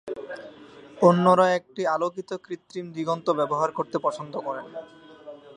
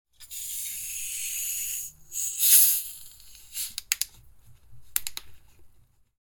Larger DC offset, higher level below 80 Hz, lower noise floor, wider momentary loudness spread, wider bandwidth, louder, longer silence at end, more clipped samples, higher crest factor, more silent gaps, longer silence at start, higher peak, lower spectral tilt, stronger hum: neither; second, -72 dBFS vs -60 dBFS; second, -47 dBFS vs -58 dBFS; about the same, 21 LU vs 21 LU; second, 10 kHz vs 19.5 kHz; about the same, -24 LUFS vs -24 LUFS; second, 0.05 s vs 0.55 s; neither; second, 22 dB vs 28 dB; neither; second, 0.05 s vs 0.2 s; about the same, -4 dBFS vs -2 dBFS; first, -6.5 dB/octave vs 3.5 dB/octave; neither